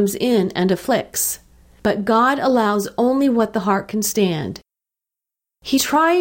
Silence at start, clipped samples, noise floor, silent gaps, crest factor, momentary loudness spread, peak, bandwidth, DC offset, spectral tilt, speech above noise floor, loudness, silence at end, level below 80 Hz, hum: 0 s; under 0.1%; -86 dBFS; none; 14 dB; 8 LU; -6 dBFS; 17 kHz; under 0.1%; -4.5 dB/octave; 69 dB; -18 LUFS; 0 s; -52 dBFS; none